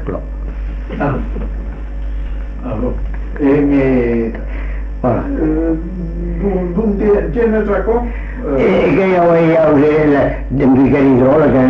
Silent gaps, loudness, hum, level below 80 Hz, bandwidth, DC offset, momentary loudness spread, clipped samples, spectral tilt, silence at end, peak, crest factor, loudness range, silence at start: none; -14 LUFS; none; -22 dBFS; 6 kHz; under 0.1%; 15 LU; under 0.1%; -10 dB/octave; 0 s; -2 dBFS; 10 dB; 6 LU; 0 s